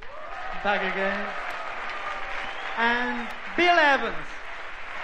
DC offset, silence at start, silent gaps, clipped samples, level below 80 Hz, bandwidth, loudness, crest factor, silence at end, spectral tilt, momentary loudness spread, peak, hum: 1%; 0 s; none; under 0.1%; -50 dBFS; 10 kHz; -25 LUFS; 20 dB; 0 s; -4 dB/octave; 17 LU; -8 dBFS; none